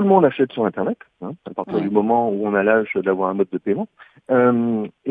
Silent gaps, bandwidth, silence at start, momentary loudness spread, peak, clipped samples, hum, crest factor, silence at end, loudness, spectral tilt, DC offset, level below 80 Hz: none; 4 kHz; 0 s; 14 LU; 0 dBFS; under 0.1%; none; 18 dB; 0 s; -19 LUFS; -10 dB/octave; under 0.1%; -64 dBFS